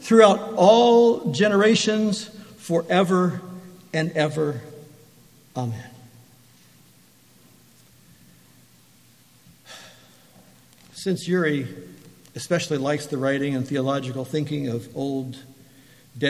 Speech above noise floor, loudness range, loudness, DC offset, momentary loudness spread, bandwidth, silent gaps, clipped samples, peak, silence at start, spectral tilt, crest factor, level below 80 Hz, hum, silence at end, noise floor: 35 dB; 20 LU; -21 LUFS; under 0.1%; 24 LU; 15 kHz; none; under 0.1%; -2 dBFS; 0 s; -5.5 dB/octave; 22 dB; -68 dBFS; none; 0 s; -55 dBFS